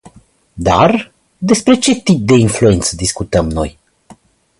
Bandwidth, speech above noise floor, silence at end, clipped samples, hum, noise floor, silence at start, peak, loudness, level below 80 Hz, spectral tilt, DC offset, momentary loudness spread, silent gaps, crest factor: 11.5 kHz; 34 dB; 0.9 s; under 0.1%; none; -46 dBFS; 0.05 s; 0 dBFS; -13 LUFS; -32 dBFS; -5 dB/octave; under 0.1%; 10 LU; none; 14 dB